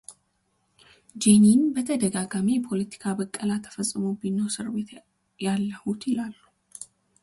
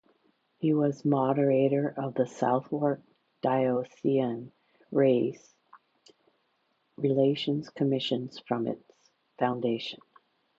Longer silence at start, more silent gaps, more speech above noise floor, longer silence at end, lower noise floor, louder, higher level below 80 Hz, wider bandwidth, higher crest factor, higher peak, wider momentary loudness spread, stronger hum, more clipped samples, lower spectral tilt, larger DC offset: second, 0.1 s vs 0.6 s; neither; about the same, 47 dB vs 46 dB; second, 0.4 s vs 0.6 s; about the same, -71 dBFS vs -74 dBFS; first, -25 LUFS vs -28 LUFS; first, -64 dBFS vs -76 dBFS; first, 11.5 kHz vs 7.8 kHz; about the same, 20 dB vs 18 dB; first, -6 dBFS vs -12 dBFS; first, 17 LU vs 10 LU; neither; neither; second, -5 dB/octave vs -7.5 dB/octave; neither